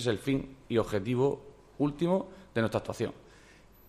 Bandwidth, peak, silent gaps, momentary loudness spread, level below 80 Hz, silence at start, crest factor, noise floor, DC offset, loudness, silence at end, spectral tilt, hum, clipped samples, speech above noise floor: 15 kHz; -16 dBFS; none; 8 LU; -56 dBFS; 0 s; 16 dB; -57 dBFS; under 0.1%; -32 LUFS; 0.7 s; -6.5 dB/octave; none; under 0.1%; 26 dB